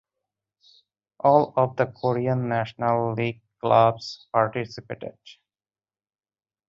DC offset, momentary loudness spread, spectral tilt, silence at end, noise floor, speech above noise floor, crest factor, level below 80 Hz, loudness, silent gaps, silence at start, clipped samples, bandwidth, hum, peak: under 0.1%; 16 LU; -7.5 dB/octave; 1.35 s; under -90 dBFS; over 67 dB; 22 dB; -64 dBFS; -23 LUFS; none; 1.25 s; under 0.1%; 7.6 kHz; none; -4 dBFS